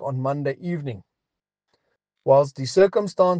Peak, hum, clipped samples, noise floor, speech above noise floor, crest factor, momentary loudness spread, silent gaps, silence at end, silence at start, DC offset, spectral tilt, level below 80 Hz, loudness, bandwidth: -4 dBFS; none; under 0.1%; -86 dBFS; 65 dB; 18 dB; 13 LU; none; 0 s; 0 s; under 0.1%; -6.5 dB/octave; -66 dBFS; -22 LUFS; 9.2 kHz